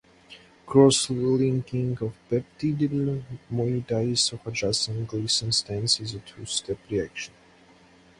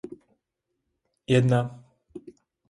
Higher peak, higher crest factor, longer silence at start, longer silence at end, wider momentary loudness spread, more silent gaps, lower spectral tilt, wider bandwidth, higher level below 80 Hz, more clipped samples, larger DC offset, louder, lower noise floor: first, -4 dBFS vs -10 dBFS; about the same, 22 dB vs 20 dB; first, 0.3 s vs 0.05 s; first, 0.95 s vs 0.4 s; second, 12 LU vs 25 LU; neither; second, -4.5 dB/octave vs -7 dB/octave; about the same, 11.5 kHz vs 11 kHz; first, -56 dBFS vs -62 dBFS; neither; neither; about the same, -25 LUFS vs -24 LUFS; second, -55 dBFS vs -81 dBFS